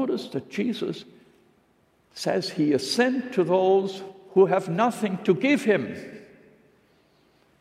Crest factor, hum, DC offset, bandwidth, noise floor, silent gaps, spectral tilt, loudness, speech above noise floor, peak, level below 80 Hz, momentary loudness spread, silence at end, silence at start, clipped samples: 18 dB; none; under 0.1%; 14.5 kHz; -64 dBFS; none; -5.5 dB/octave; -24 LUFS; 40 dB; -8 dBFS; -74 dBFS; 14 LU; 1.35 s; 0 s; under 0.1%